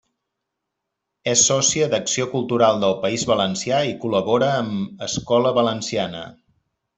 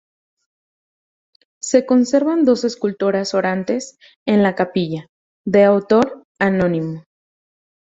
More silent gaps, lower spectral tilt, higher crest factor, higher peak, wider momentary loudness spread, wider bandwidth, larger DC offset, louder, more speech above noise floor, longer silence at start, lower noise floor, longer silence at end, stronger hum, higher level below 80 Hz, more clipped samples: second, none vs 4.16-4.26 s, 5.09-5.44 s, 6.25-6.35 s; second, -3.5 dB/octave vs -6 dB/octave; about the same, 18 dB vs 16 dB; about the same, -4 dBFS vs -2 dBFS; second, 11 LU vs 14 LU; about the same, 8.4 kHz vs 8 kHz; neither; second, -20 LUFS vs -17 LUFS; second, 60 dB vs over 73 dB; second, 1.25 s vs 1.65 s; second, -80 dBFS vs under -90 dBFS; second, 0.65 s vs 0.95 s; neither; about the same, -58 dBFS vs -58 dBFS; neither